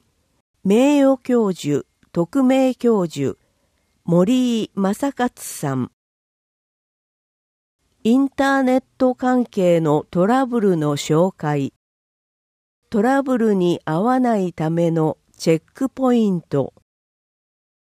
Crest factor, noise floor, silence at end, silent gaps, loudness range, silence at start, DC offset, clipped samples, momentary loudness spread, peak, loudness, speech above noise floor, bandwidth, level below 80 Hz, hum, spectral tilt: 16 dB; -65 dBFS; 1.15 s; 5.93-7.79 s, 11.76-12.82 s; 5 LU; 0.65 s; under 0.1%; under 0.1%; 8 LU; -4 dBFS; -19 LUFS; 47 dB; 15.5 kHz; -60 dBFS; none; -6.5 dB/octave